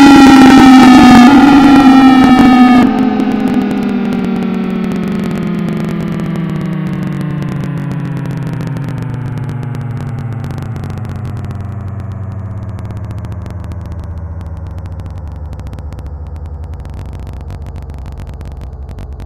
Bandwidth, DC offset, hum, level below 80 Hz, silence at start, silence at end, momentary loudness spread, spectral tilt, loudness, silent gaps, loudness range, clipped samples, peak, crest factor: 14 kHz; under 0.1%; none; -30 dBFS; 0 s; 0 s; 23 LU; -6.5 dB/octave; -9 LUFS; none; 20 LU; 2%; 0 dBFS; 10 dB